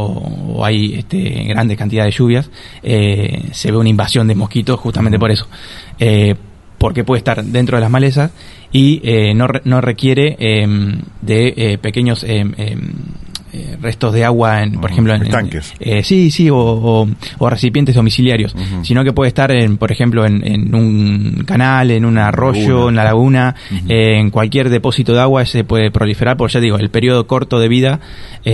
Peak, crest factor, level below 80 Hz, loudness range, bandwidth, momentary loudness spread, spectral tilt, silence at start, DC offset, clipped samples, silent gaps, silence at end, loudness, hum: 0 dBFS; 12 dB; -34 dBFS; 4 LU; 12 kHz; 9 LU; -7 dB/octave; 0 s; under 0.1%; under 0.1%; none; 0 s; -13 LUFS; none